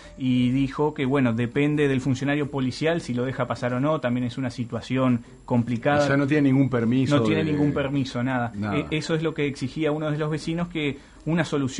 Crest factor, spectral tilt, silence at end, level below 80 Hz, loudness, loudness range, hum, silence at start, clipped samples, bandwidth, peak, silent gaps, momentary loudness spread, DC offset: 16 dB; -7 dB/octave; 0 s; -50 dBFS; -24 LUFS; 4 LU; none; 0 s; under 0.1%; 10.5 kHz; -6 dBFS; none; 7 LU; under 0.1%